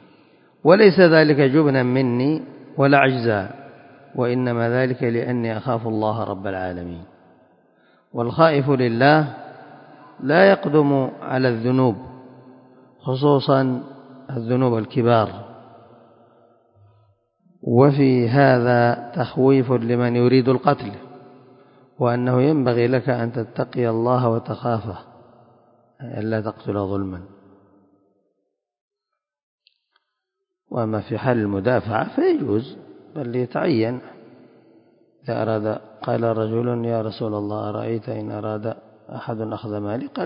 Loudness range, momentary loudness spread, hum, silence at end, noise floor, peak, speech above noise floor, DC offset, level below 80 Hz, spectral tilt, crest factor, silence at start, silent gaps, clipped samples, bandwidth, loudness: 10 LU; 17 LU; none; 0 s; -82 dBFS; 0 dBFS; 63 dB; under 0.1%; -56 dBFS; -12 dB/octave; 20 dB; 0.65 s; 28.81-28.88 s, 29.43-29.58 s; under 0.1%; 5.4 kHz; -20 LUFS